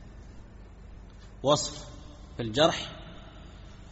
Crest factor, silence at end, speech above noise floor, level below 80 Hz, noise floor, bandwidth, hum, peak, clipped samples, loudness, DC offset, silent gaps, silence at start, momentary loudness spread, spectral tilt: 24 dB; 0 s; 20 dB; -48 dBFS; -48 dBFS; 8 kHz; none; -8 dBFS; under 0.1%; -28 LUFS; under 0.1%; none; 0 s; 25 LU; -3.5 dB/octave